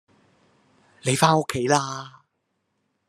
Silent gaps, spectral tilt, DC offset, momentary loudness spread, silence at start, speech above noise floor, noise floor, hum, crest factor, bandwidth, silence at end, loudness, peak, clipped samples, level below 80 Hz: none; -4.5 dB/octave; under 0.1%; 16 LU; 1.05 s; 53 dB; -75 dBFS; none; 26 dB; 13 kHz; 1 s; -22 LUFS; 0 dBFS; under 0.1%; -64 dBFS